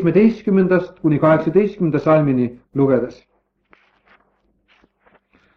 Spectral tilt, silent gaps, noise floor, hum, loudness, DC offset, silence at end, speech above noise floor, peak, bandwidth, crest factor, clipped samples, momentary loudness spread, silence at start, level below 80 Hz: -10 dB/octave; none; -62 dBFS; none; -17 LUFS; under 0.1%; 2.45 s; 46 dB; -2 dBFS; 6.4 kHz; 16 dB; under 0.1%; 6 LU; 0 s; -54 dBFS